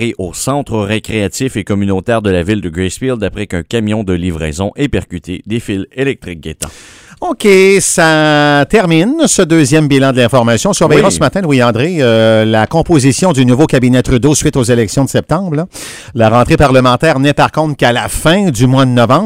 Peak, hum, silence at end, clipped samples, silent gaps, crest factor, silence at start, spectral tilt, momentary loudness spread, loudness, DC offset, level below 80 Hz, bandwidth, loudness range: 0 dBFS; none; 0 s; 0.6%; none; 10 dB; 0 s; -5 dB/octave; 10 LU; -10 LUFS; under 0.1%; -32 dBFS; 16.5 kHz; 8 LU